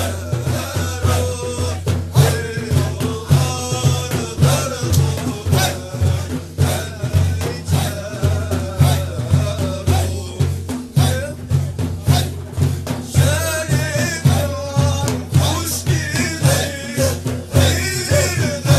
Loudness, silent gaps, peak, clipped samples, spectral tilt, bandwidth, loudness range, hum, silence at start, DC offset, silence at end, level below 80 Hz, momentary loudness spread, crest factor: -18 LUFS; none; 0 dBFS; under 0.1%; -5 dB/octave; 14 kHz; 2 LU; none; 0 s; under 0.1%; 0 s; -34 dBFS; 6 LU; 18 dB